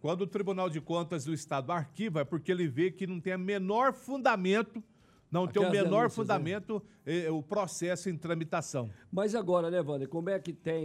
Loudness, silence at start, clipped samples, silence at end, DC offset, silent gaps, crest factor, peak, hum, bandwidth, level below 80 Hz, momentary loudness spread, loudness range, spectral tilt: -32 LUFS; 0.05 s; under 0.1%; 0 s; under 0.1%; none; 18 dB; -14 dBFS; none; 13.5 kHz; -74 dBFS; 8 LU; 3 LU; -6 dB/octave